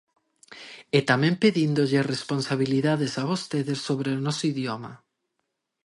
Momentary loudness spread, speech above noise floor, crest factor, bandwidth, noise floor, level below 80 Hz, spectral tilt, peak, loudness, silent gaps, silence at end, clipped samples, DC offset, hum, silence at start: 13 LU; 55 dB; 20 dB; 11.5 kHz; -79 dBFS; -68 dBFS; -6 dB/octave; -6 dBFS; -25 LUFS; none; 0.9 s; under 0.1%; under 0.1%; none; 0.5 s